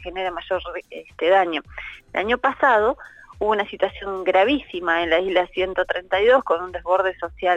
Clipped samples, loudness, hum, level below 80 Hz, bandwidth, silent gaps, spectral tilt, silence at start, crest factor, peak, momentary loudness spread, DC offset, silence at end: under 0.1%; -21 LUFS; none; -48 dBFS; 8 kHz; none; -5 dB/octave; 0 s; 16 dB; -6 dBFS; 11 LU; under 0.1%; 0 s